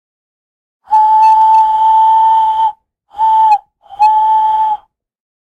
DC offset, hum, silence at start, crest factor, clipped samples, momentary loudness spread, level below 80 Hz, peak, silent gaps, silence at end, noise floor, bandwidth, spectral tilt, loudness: under 0.1%; none; 0.9 s; 10 dB; under 0.1%; 8 LU; -54 dBFS; -2 dBFS; none; 0.7 s; -32 dBFS; 6.6 kHz; -1.5 dB/octave; -10 LUFS